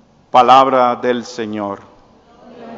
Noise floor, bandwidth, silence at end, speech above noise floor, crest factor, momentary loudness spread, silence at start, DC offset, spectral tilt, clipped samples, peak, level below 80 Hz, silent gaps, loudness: -47 dBFS; 7.8 kHz; 0 s; 34 dB; 16 dB; 16 LU; 0.35 s; under 0.1%; -4.5 dB/octave; 0.2%; 0 dBFS; -58 dBFS; none; -13 LUFS